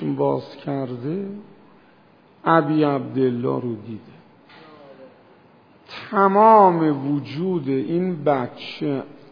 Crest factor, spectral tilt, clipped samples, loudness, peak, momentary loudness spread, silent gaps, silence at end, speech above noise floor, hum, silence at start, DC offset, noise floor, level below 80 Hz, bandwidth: 20 dB; -9.5 dB/octave; under 0.1%; -20 LUFS; 0 dBFS; 18 LU; none; 0.2 s; 33 dB; none; 0 s; under 0.1%; -53 dBFS; -70 dBFS; 5.2 kHz